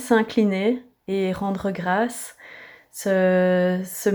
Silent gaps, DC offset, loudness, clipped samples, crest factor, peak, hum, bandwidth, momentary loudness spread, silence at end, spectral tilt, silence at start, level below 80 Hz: none; under 0.1%; -22 LUFS; under 0.1%; 16 dB; -6 dBFS; none; over 20 kHz; 19 LU; 0 s; -6 dB/octave; 0 s; -58 dBFS